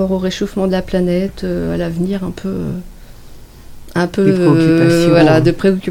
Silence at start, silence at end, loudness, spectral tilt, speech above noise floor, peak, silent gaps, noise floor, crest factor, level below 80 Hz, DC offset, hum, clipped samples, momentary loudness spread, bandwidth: 0 s; 0 s; -14 LUFS; -7 dB/octave; 21 dB; 0 dBFS; none; -35 dBFS; 14 dB; -34 dBFS; under 0.1%; none; under 0.1%; 12 LU; 16 kHz